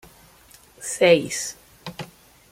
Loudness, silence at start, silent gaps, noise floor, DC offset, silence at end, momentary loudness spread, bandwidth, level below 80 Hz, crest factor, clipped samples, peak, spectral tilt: -21 LUFS; 0.8 s; none; -52 dBFS; under 0.1%; 0.45 s; 22 LU; 16 kHz; -60 dBFS; 22 dB; under 0.1%; -4 dBFS; -3.5 dB/octave